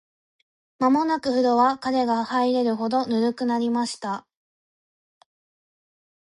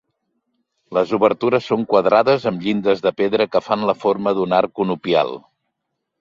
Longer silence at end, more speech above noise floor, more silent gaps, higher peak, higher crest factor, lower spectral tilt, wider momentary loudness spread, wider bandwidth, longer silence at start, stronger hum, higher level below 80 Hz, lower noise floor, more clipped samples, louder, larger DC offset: first, 2.1 s vs 0.85 s; first, over 68 dB vs 60 dB; neither; second, -8 dBFS vs -2 dBFS; about the same, 16 dB vs 18 dB; second, -5 dB/octave vs -7 dB/octave; about the same, 7 LU vs 6 LU; first, 11.5 kHz vs 7.4 kHz; about the same, 0.8 s vs 0.9 s; neither; second, -68 dBFS vs -60 dBFS; first, under -90 dBFS vs -77 dBFS; neither; second, -23 LUFS vs -18 LUFS; neither